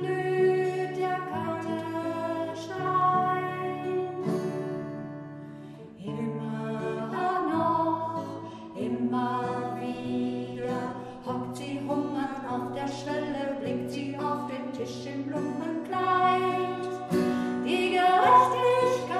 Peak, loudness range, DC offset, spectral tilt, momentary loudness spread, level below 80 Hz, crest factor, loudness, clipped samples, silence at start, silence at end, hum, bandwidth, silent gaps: -8 dBFS; 6 LU; under 0.1%; -6 dB/octave; 12 LU; -68 dBFS; 20 dB; -28 LUFS; under 0.1%; 0 s; 0 s; none; 13.5 kHz; none